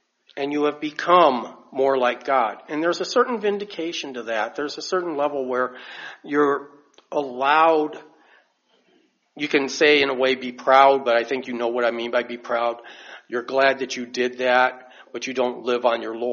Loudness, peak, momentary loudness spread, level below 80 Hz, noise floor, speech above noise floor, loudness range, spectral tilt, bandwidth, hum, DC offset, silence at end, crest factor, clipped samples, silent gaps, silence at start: -21 LUFS; -2 dBFS; 14 LU; -72 dBFS; -64 dBFS; 42 dB; 5 LU; -1 dB/octave; 7.2 kHz; none; under 0.1%; 0 s; 20 dB; under 0.1%; none; 0.35 s